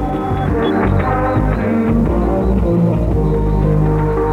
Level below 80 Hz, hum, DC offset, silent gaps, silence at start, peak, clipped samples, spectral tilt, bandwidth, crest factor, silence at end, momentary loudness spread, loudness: -20 dBFS; none; under 0.1%; none; 0 s; -2 dBFS; under 0.1%; -9.5 dB/octave; 5.2 kHz; 12 dB; 0 s; 2 LU; -15 LUFS